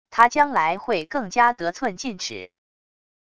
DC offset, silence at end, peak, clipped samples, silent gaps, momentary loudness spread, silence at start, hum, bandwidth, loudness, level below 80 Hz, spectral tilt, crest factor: 0.5%; 0.8 s; -2 dBFS; under 0.1%; none; 13 LU; 0.1 s; none; 11 kHz; -22 LUFS; -60 dBFS; -3 dB/octave; 22 dB